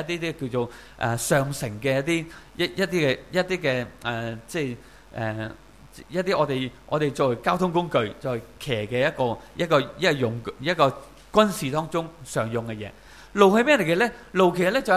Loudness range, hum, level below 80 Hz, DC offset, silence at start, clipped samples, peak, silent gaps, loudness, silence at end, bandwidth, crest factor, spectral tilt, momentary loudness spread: 5 LU; none; -52 dBFS; 0.1%; 0 s; under 0.1%; -2 dBFS; none; -24 LUFS; 0 s; 15.5 kHz; 22 dB; -5 dB/octave; 12 LU